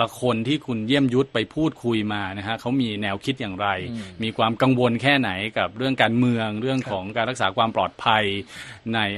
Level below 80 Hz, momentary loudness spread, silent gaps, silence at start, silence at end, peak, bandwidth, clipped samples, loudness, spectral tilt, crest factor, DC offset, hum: -56 dBFS; 8 LU; none; 0 s; 0 s; -2 dBFS; 12.5 kHz; under 0.1%; -23 LUFS; -6 dB/octave; 20 dB; under 0.1%; none